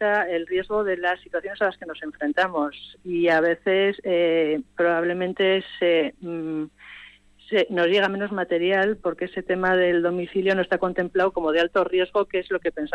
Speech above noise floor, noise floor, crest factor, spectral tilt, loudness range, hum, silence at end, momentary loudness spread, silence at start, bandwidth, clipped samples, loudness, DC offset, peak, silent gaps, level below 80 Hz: 26 dB; -49 dBFS; 12 dB; -6.5 dB/octave; 2 LU; 50 Hz at -55 dBFS; 0 s; 10 LU; 0 s; 8.2 kHz; under 0.1%; -23 LUFS; under 0.1%; -10 dBFS; none; -58 dBFS